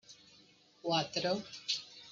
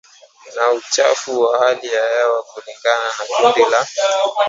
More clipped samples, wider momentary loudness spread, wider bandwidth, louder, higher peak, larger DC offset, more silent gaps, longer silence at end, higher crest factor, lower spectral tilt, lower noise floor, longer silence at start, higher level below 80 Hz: neither; first, 18 LU vs 6 LU; first, 9.2 kHz vs 7.8 kHz; second, -36 LUFS vs -16 LUFS; second, -18 dBFS vs 0 dBFS; neither; neither; about the same, 0 s vs 0 s; about the same, 20 dB vs 16 dB; first, -3.5 dB/octave vs -1 dB/octave; first, -64 dBFS vs -43 dBFS; second, 0.1 s vs 0.45 s; second, -78 dBFS vs -72 dBFS